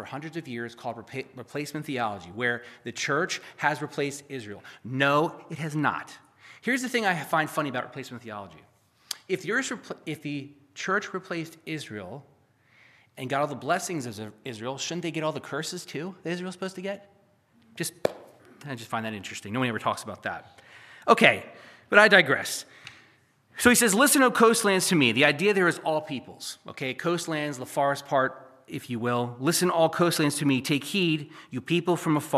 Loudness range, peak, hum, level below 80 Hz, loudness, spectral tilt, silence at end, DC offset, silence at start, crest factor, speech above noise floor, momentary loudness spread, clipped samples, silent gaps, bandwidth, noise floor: 12 LU; -2 dBFS; none; -70 dBFS; -26 LUFS; -3.5 dB/octave; 0 s; under 0.1%; 0 s; 26 dB; 36 dB; 19 LU; under 0.1%; none; 15 kHz; -62 dBFS